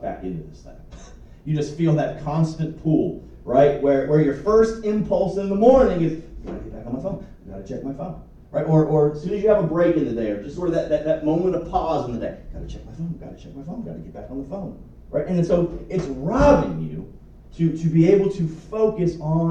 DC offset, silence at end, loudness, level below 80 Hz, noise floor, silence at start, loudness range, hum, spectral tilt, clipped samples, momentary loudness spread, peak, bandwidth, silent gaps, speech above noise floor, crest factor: under 0.1%; 0 s; -21 LUFS; -40 dBFS; -43 dBFS; 0 s; 8 LU; none; -8.5 dB/octave; under 0.1%; 18 LU; -2 dBFS; 8.2 kHz; none; 22 dB; 20 dB